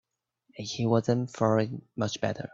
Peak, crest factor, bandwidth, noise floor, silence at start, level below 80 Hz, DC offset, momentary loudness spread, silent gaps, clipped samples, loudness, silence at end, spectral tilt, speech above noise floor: -10 dBFS; 20 dB; 7.8 kHz; -70 dBFS; 0.55 s; -64 dBFS; under 0.1%; 9 LU; none; under 0.1%; -29 LUFS; 0.05 s; -6 dB/octave; 42 dB